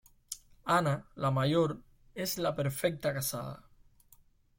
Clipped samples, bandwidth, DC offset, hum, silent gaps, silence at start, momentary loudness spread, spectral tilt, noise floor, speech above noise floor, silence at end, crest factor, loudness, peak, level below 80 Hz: under 0.1%; 16.5 kHz; under 0.1%; none; none; 0.3 s; 16 LU; -5 dB/octave; -63 dBFS; 32 dB; 1 s; 18 dB; -32 LUFS; -16 dBFS; -62 dBFS